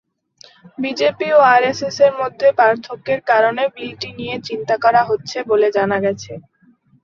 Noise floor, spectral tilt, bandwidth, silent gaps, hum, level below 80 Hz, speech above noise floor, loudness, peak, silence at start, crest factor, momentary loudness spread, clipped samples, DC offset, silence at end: -54 dBFS; -4.5 dB/octave; 7.4 kHz; none; none; -60 dBFS; 38 dB; -16 LUFS; 0 dBFS; 0.8 s; 16 dB; 13 LU; under 0.1%; under 0.1%; 0.65 s